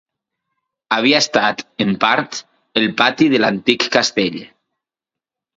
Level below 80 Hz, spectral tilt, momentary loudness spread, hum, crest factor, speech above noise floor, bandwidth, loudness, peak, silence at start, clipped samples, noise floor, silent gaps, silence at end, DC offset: -62 dBFS; -3.5 dB/octave; 9 LU; none; 18 dB; 71 dB; 7.8 kHz; -16 LUFS; 0 dBFS; 0.9 s; under 0.1%; -87 dBFS; none; 1.1 s; under 0.1%